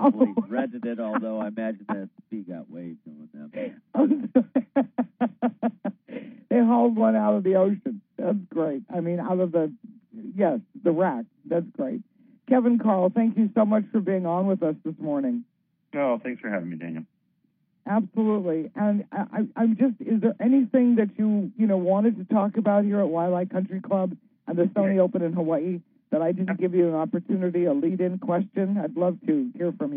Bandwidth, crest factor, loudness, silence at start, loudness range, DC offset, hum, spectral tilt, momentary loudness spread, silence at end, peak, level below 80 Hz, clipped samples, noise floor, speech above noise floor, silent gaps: 3.7 kHz; 18 dB; -25 LUFS; 0 s; 6 LU; under 0.1%; none; -9 dB/octave; 14 LU; 0 s; -6 dBFS; -80 dBFS; under 0.1%; -70 dBFS; 46 dB; none